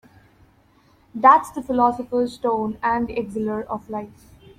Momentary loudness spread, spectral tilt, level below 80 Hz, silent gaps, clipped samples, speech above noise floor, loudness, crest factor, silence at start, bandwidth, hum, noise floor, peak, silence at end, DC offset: 17 LU; -6.5 dB/octave; -52 dBFS; none; under 0.1%; 36 dB; -21 LUFS; 20 dB; 1.15 s; 15 kHz; none; -57 dBFS; -2 dBFS; 0.5 s; under 0.1%